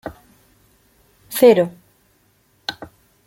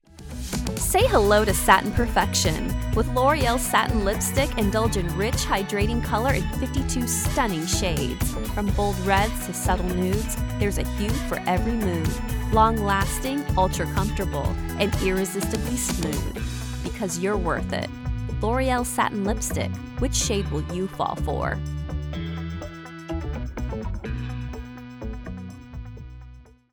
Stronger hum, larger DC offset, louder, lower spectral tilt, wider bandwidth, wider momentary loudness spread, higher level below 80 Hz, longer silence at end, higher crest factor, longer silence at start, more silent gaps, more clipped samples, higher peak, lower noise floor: neither; neither; first, -17 LUFS vs -24 LUFS; about the same, -5 dB/octave vs -4.5 dB/octave; second, 17 kHz vs 19.5 kHz; first, 23 LU vs 12 LU; second, -58 dBFS vs -32 dBFS; about the same, 0.4 s vs 0.3 s; about the same, 20 dB vs 22 dB; about the same, 0.05 s vs 0.15 s; neither; neither; about the same, -2 dBFS vs -2 dBFS; first, -60 dBFS vs -46 dBFS